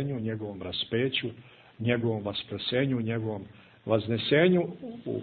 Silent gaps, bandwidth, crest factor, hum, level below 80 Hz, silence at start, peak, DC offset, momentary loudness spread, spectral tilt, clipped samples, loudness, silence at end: none; 4.6 kHz; 20 dB; none; -64 dBFS; 0 s; -10 dBFS; under 0.1%; 14 LU; -10 dB/octave; under 0.1%; -29 LUFS; 0 s